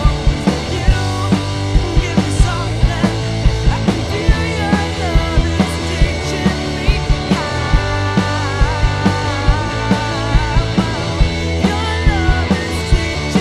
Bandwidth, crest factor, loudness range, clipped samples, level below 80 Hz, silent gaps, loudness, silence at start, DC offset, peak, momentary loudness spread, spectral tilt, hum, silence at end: 12.5 kHz; 14 dB; 0 LU; under 0.1%; -18 dBFS; none; -16 LUFS; 0 s; 0.3%; 0 dBFS; 2 LU; -5.5 dB/octave; none; 0 s